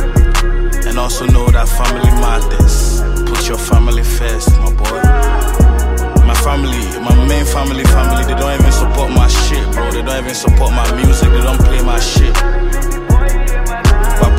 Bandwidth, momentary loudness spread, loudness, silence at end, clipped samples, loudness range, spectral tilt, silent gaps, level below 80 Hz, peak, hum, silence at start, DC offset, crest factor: 16 kHz; 6 LU; -13 LUFS; 0 s; under 0.1%; 1 LU; -5 dB/octave; none; -10 dBFS; 0 dBFS; none; 0 s; under 0.1%; 10 dB